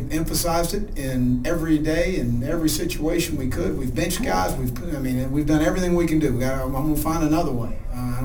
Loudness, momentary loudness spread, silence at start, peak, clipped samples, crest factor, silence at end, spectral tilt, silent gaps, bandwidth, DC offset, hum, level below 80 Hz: -23 LUFS; 7 LU; 0 s; -6 dBFS; under 0.1%; 16 dB; 0 s; -5.5 dB/octave; none; over 20 kHz; under 0.1%; none; -30 dBFS